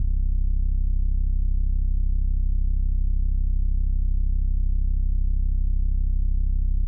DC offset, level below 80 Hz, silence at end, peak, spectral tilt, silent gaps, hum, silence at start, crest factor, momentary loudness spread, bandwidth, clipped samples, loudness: under 0.1%; -20 dBFS; 0 s; -14 dBFS; -20.5 dB/octave; none; none; 0 s; 6 dB; 0 LU; 0.4 kHz; under 0.1%; -27 LUFS